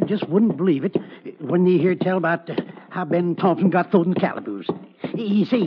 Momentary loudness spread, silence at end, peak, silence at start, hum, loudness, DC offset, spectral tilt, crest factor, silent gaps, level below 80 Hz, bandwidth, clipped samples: 12 LU; 0 s; -4 dBFS; 0 s; none; -21 LUFS; under 0.1%; -7 dB/octave; 18 dB; none; -74 dBFS; 5.4 kHz; under 0.1%